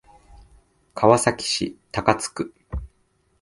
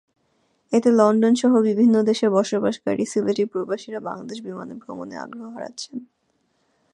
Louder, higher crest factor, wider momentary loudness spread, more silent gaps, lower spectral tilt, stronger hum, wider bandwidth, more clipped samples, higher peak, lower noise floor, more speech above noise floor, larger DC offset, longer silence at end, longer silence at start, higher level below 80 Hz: about the same, -22 LUFS vs -20 LUFS; first, 24 dB vs 18 dB; about the same, 18 LU vs 18 LU; neither; second, -4 dB/octave vs -5.5 dB/octave; neither; about the same, 11.5 kHz vs 10.5 kHz; neither; about the same, 0 dBFS vs -2 dBFS; about the same, -65 dBFS vs -68 dBFS; second, 44 dB vs 48 dB; neither; second, 0.55 s vs 0.9 s; first, 0.95 s vs 0.7 s; first, -42 dBFS vs -70 dBFS